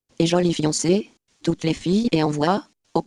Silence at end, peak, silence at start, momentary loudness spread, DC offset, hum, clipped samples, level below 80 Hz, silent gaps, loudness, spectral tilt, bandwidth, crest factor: 0.05 s; -4 dBFS; 0.2 s; 7 LU; under 0.1%; none; under 0.1%; -52 dBFS; none; -22 LUFS; -5.5 dB/octave; 11.5 kHz; 18 dB